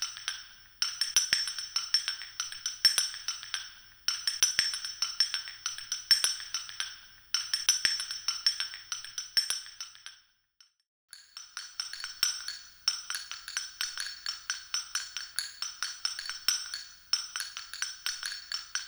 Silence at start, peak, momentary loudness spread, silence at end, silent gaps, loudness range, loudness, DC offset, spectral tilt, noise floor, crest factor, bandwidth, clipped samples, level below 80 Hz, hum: 0 s; -6 dBFS; 13 LU; 0 s; 10.88-11.08 s; 7 LU; -31 LUFS; under 0.1%; 4 dB/octave; -66 dBFS; 30 dB; over 20 kHz; under 0.1%; -70 dBFS; none